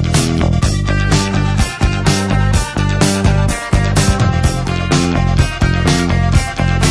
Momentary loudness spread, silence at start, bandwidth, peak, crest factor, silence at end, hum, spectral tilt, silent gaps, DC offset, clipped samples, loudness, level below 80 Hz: 3 LU; 0 s; 11 kHz; 0 dBFS; 12 dB; 0 s; none; -5 dB/octave; none; under 0.1%; under 0.1%; -14 LUFS; -20 dBFS